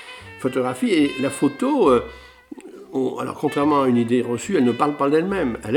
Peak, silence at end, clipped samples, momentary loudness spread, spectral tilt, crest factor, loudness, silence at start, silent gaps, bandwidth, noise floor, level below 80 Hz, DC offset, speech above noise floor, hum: -2 dBFS; 0 s; under 0.1%; 12 LU; -6 dB/octave; 18 dB; -20 LUFS; 0 s; none; 17.5 kHz; -40 dBFS; -52 dBFS; under 0.1%; 21 dB; none